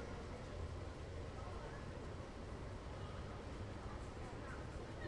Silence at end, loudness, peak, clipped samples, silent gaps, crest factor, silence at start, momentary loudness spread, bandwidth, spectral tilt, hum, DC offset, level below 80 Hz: 0 s; -50 LUFS; -36 dBFS; under 0.1%; none; 12 dB; 0 s; 1 LU; 11 kHz; -6 dB/octave; none; under 0.1%; -54 dBFS